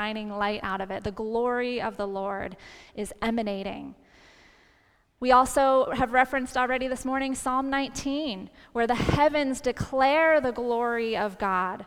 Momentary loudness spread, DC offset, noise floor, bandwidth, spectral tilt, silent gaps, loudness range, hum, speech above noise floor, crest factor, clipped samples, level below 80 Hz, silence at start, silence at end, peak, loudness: 13 LU; under 0.1%; -64 dBFS; 16 kHz; -4.5 dB/octave; none; 7 LU; none; 38 dB; 20 dB; under 0.1%; -48 dBFS; 0 s; 0 s; -8 dBFS; -26 LUFS